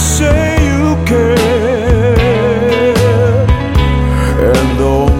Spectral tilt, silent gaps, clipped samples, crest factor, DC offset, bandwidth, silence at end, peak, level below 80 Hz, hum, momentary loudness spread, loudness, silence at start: -6 dB/octave; none; under 0.1%; 10 dB; under 0.1%; 16.5 kHz; 0 s; 0 dBFS; -16 dBFS; none; 2 LU; -11 LUFS; 0 s